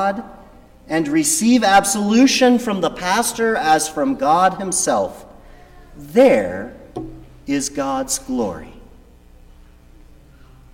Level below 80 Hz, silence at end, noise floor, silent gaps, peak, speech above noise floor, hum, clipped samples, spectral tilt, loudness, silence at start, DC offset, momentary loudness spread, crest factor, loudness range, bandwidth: -46 dBFS; 1.9 s; -45 dBFS; none; -2 dBFS; 29 dB; 60 Hz at -50 dBFS; under 0.1%; -3.5 dB/octave; -17 LUFS; 0 s; under 0.1%; 17 LU; 16 dB; 10 LU; 17 kHz